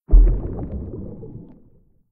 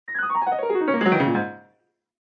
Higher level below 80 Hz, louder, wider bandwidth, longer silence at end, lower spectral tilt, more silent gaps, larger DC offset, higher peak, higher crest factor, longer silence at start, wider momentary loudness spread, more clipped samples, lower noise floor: first, -20 dBFS vs -72 dBFS; about the same, -24 LUFS vs -22 LUFS; second, 1.4 kHz vs 6.4 kHz; about the same, 0.7 s vs 0.6 s; first, -14.5 dB/octave vs -8.5 dB/octave; neither; neither; first, -2 dBFS vs -6 dBFS; about the same, 18 dB vs 18 dB; about the same, 0.1 s vs 0.1 s; first, 21 LU vs 6 LU; neither; second, -53 dBFS vs -67 dBFS